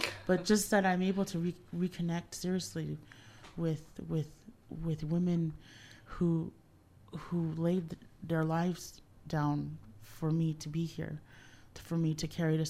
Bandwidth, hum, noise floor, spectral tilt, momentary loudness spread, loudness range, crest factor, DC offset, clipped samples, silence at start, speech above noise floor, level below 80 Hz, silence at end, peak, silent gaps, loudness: 15 kHz; none; -61 dBFS; -6 dB/octave; 19 LU; 4 LU; 24 dB; under 0.1%; under 0.1%; 0 s; 27 dB; -58 dBFS; 0 s; -12 dBFS; none; -35 LUFS